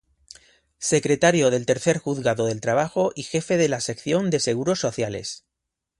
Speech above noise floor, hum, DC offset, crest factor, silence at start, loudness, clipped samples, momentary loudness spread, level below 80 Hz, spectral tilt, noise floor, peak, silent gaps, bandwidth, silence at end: 61 dB; none; under 0.1%; 18 dB; 0.8 s; -22 LUFS; under 0.1%; 9 LU; -58 dBFS; -4.5 dB/octave; -83 dBFS; -4 dBFS; none; 11.5 kHz; 0.65 s